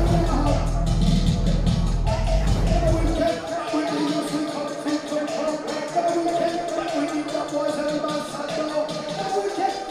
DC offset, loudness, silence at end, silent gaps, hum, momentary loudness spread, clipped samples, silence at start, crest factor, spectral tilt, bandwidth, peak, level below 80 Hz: under 0.1%; -24 LUFS; 0 s; none; none; 5 LU; under 0.1%; 0 s; 14 dB; -6 dB/octave; 12.5 kHz; -8 dBFS; -28 dBFS